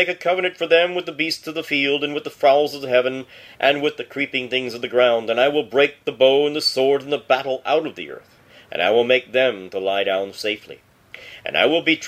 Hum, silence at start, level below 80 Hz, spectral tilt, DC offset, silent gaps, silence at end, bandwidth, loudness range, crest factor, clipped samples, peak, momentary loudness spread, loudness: none; 0 s; -66 dBFS; -3.5 dB/octave; under 0.1%; none; 0 s; 15.5 kHz; 3 LU; 18 dB; under 0.1%; -2 dBFS; 9 LU; -19 LUFS